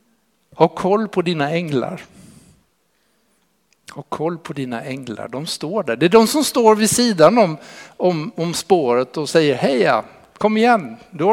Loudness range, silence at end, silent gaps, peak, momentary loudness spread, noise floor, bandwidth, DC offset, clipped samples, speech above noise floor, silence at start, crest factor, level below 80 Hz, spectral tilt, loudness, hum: 13 LU; 0 s; none; 0 dBFS; 16 LU; -64 dBFS; 16.5 kHz; under 0.1%; under 0.1%; 47 dB; 0.55 s; 18 dB; -60 dBFS; -4.5 dB/octave; -17 LUFS; none